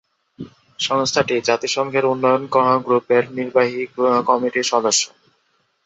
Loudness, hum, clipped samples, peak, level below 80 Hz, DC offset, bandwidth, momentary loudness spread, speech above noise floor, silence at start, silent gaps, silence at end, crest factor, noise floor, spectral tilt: -18 LUFS; none; under 0.1%; -2 dBFS; -64 dBFS; under 0.1%; 8.2 kHz; 9 LU; 47 dB; 0.4 s; none; 0.8 s; 18 dB; -65 dBFS; -3 dB/octave